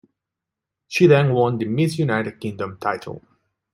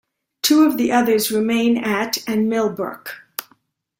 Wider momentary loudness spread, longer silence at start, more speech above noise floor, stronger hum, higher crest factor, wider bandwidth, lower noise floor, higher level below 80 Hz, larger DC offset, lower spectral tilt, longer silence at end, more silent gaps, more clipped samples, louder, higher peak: about the same, 15 LU vs 16 LU; first, 0.9 s vs 0.45 s; first, 65 dB vs 42 dB; neither; about the same, 18 dB vs 16 dB; second, 13 kHz vs 16.5 kHz; first, -85 dBFS vs -60 dBFS; about the same, -62 dBFS vs -62 dBFS; neither; first, -7 dB/octave vs -3.5 dB/octave; about the same, 0.55 s vs 0.55 s; neither; neither; about the same, -20 LUFS vs -18 LUFS; about the same, -2 dBFS vs -2 dBFS